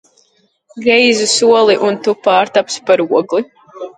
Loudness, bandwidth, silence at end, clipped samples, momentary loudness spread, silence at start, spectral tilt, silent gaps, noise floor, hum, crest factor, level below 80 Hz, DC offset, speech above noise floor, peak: -12 LUFS; 11 kHz; 0.1 s; under 0.1%; 9 LU; 0.75 s; -2.5 dB/octave; none; -57 dBFS; none; 14 dB; -62 dBFS; under 0.1%; 45 dB; 0 dBFS